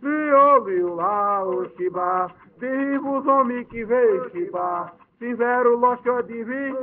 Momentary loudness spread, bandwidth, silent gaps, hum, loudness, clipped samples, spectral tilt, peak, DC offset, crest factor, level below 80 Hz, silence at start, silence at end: 13 LU; 3.6 kHz; none; none; -21 LUFS; under 0.1%; -5.5 dB/octave; -4 dBFS; under 0.1%; 16 dB; -62 dBFS; 0 s; 0 s